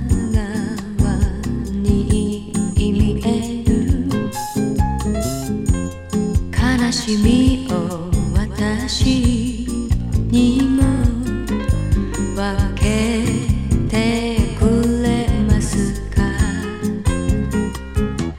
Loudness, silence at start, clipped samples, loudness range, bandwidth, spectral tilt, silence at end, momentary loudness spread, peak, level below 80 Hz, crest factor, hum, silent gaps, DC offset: -19 LUFS; 0 s; under 0.1%; 2 LU; 16 kHz; -6 dB/octave; 0 s; 7 LU; -2 dBFS; -24 dBFS; 16 dB; none; none; under 0.1%